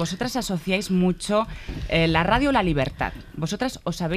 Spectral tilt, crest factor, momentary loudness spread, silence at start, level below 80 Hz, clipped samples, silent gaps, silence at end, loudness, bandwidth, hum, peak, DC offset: -5.5 dB/octave; 18 dB; 10 LU; 0 s; -38 dBFS; under 0.1%; none; 0 s; -23 LUFS; 15 kHz; none; -6 dBFS; under 0.1%